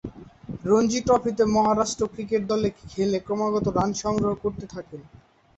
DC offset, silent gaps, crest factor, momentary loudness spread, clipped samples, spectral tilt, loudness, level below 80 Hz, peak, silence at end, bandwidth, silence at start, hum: under 0.1%; none; 16 dB; 18 LU; under 0.1%; -5.5 dB/octave; -24 LUFS; -50 dBFS; -8 dBFS; 0.55 s; 8.4 kHz; 0.05 s; none